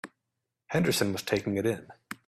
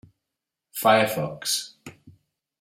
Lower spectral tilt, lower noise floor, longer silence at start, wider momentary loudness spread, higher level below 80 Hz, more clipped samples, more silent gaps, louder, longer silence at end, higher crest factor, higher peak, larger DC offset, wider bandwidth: first, -4.5 dB/octave vs -3 dB/octave; about the same, -85 dBFS vs -85 dBFS; second, 0.05 s vs 0.75 s; about the same, 15 LU vs 16 LU; about the same, -64 dBFS vs -68 dBFS; neither; neither; second, -29 LUFS vs -23 LUFS; second, 0.1 s vs 0.5 s; about the same, 20 dB vs 24 dB; second, -12 dBFS vs -4 dBFS; neither; about the same, 15.5 kHz vs 16 kHz